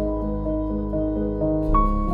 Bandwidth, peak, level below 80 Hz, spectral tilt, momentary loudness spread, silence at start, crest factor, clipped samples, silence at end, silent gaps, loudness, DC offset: 3.6 kHz; -6 dBFS; -26 dBFS; -11 dB/octave; 5 LU; 0 s; 16 dB; under 0.1%; 0 s; none; -24 LUFS; under 0.1%